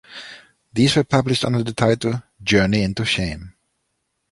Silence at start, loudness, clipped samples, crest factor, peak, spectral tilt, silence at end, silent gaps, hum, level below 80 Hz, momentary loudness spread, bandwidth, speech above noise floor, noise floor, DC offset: 0.1 s; -19 LUFS; under 0.1%; 18 dB; -2 dBFS; -5.5 dB/octave; 0.8 s; none; none; -44 dBFS; 17 LU; 11.5 kHz; 54 dB; -73 dBFS; under 0.1%